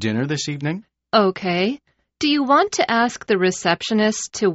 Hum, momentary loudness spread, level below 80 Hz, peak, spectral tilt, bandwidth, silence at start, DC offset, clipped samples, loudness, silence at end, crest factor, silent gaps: none; 8 LU; -60 dBFS; -2 dBFS; -3.5 dB/octave; 8 kHz; 0 s; under 0.1%; under 0.1%; -20 LUFS; 0 s; 18 dB; none